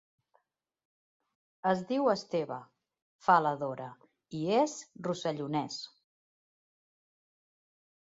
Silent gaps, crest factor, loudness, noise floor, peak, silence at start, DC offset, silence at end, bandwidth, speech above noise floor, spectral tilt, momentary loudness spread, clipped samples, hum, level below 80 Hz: 3.02-3.19 s; 24 dB; -32 LUFS; -75 dBFS; -10 dBFS; 1.65 s; under 0.1%; 2.15 s; 8 kHz; 44 dB; -5.5 dB/octave; 17 LU; under 0.1%; none; -78 dBFS